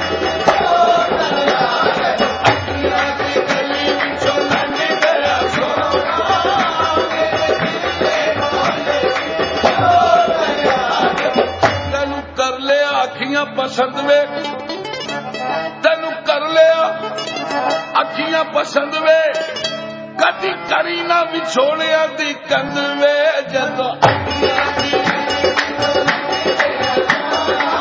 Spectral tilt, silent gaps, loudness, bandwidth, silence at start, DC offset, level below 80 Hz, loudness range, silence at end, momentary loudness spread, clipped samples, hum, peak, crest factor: -4 dB/octave; none; -16 LUFS; 7.8 kHz; 0 s; under 0.1%; -42 dBFS; 2 LU; 0 s; 6 LU; under 0.1%; none; 0 dBFS; 16 dB